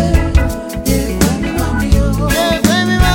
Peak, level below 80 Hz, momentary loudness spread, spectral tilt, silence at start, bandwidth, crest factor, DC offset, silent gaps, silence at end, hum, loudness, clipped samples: 0 dBFS; -18 dBFS; 5 LU; -5 dB/octave; 0 s; 17 kHz; 12 dB; under 0.1%; none; 0 s; none; -14 LUFS; under 0.1%